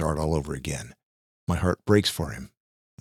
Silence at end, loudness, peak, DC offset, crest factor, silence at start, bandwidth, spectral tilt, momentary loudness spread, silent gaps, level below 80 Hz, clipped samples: 0.55 s; -26 LUFS; -6 dBFS; under 0.1%; 22 dB; 0 s; 16.5 kHz; -5.5 dB/octave; 18 LU; 1.03-1.47 s; -42 dBFS; under 0.1%